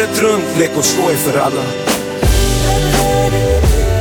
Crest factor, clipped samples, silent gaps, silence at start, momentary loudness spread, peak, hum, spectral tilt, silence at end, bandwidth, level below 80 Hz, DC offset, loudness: 12 dB; under 0.1%; none; 0 s; 4 LU; 0 dBFS; none; -4.5 dB/octave; 0 s; over 20 kHz; -20 dBFS; under 0.1%; -14 LUFS